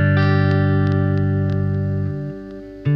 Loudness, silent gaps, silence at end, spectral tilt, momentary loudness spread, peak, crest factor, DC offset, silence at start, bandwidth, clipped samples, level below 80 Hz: -19 LUFS; none; 0 s; -10 dB/octave; 13 LU; -6 dBFS; 12 dB; under 0.1%; 0 s; 5.8 kHz; under 0.1%; -46 dBFS